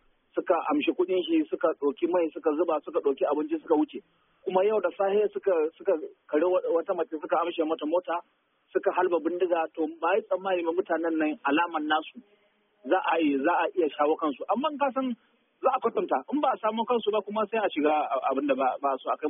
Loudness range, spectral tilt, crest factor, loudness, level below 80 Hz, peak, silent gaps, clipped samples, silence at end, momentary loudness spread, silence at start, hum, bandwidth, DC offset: 1 LU; 0.5 dB/octave; 16 dB; -27 LUFS; -78 dBFS; -10 dBFS; none; under 0.1%; 0 s; 4 LU; 0.35 s; none; 3.8 kHz; under 0.1%